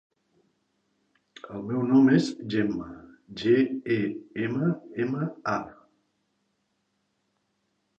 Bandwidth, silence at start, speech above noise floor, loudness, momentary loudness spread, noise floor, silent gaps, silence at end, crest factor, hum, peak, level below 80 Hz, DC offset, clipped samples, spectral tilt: 8.4 kHz; 1.45 s; 50 dB; -26 LUFS; 19 LU; -75 dBFS; none; 2.25 s; 18 dB; none; -10 dBFS; -66 dBFS; under 0.1%; under 0.1%; -7.5 dB/octave